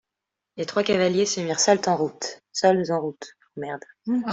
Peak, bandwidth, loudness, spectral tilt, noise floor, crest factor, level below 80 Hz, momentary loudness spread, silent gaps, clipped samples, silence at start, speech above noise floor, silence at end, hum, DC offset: -6 dBFS; 8.2 kHz; -23 LUFS; -3.5 dB/octave; -85 dBFS; 18 dB; -66 dBFS; 15 LU; none; under 0.1%; 0.55 s; 62 dB; 0 s; none; under 0.1%